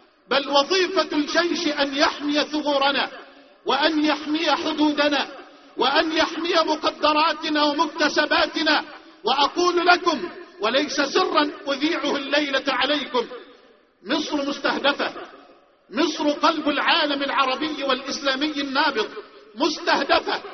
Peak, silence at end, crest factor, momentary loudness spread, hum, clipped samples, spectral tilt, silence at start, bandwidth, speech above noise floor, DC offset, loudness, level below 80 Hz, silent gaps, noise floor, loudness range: -2 dBFS; 0 s; 20 dB; 8 LU; none; under 0.1%; 0.5 dB/octave; 0.3 s; 6.4 kHz; 32 dB; under 0.1%; -21 LUFS; -62 dBFS; none; -54 dBFS; 3 LU